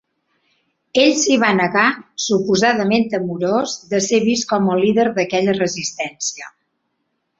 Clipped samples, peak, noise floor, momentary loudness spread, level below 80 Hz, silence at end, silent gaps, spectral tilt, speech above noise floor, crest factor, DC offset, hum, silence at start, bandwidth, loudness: under 0.1%; -2 dBFS; -71 dBFS; 9 LU; -60 dBFS; 0.9 s; none; -4 dB/octave; 54 dB; 16 dB; under 0.1%; none; 0.95 s; 8 kHz; -17 LUFS